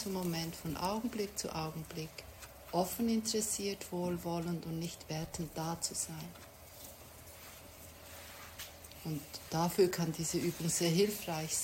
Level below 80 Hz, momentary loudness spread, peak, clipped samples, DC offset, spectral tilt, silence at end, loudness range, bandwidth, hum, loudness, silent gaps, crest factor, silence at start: -62 dBFS; 19 LU; -16 dBFS; under 0.1%; under 0.1%; -4 dB/octave; 0 s; 9 LU; 16 kHz; none; -36 LUFS; none; 20 dB; 0 s